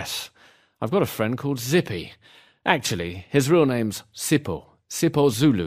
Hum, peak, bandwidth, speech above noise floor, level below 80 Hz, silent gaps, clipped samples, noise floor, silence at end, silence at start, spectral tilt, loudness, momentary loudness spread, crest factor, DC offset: none; -2 dBFS; 15.5 kHz; 25 dB; -56 dBFS; none; under 0.1%; -48 dBFS; 0 s; 0 s; -5 dB/octave; -23 LUFS; 14 LU; 22 dB; under 0.1%